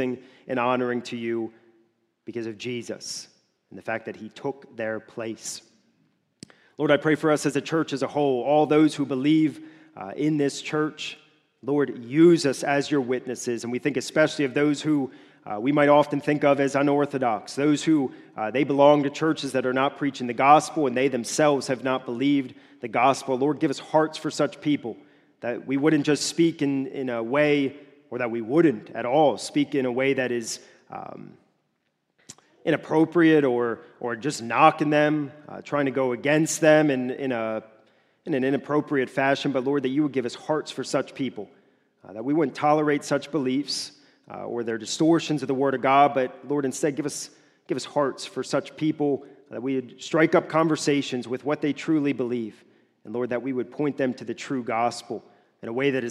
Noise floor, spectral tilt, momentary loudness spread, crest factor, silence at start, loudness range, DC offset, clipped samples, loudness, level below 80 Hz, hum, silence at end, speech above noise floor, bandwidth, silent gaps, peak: -74 dBFS; -5 dB/octave; 15 LU; 22 dB; 0 s; 7 LU; under 0.1%; under 0.1%; -24 LUFS; -76 dBFS; none; 0 s; 51 dB; 13 kHz; none; -2 dBFS